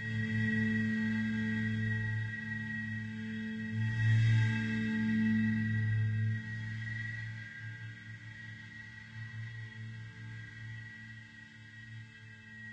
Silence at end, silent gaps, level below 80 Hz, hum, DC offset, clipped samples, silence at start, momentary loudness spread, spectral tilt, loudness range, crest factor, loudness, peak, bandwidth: 0 s; none; -62 dBFS; none; under 0.1%; under 0.1%; 0 s; 18 LU; -7.5 dB/octave; 15 LU; 16 dB; -34 LUFS; -20 dBFS; 8 kHz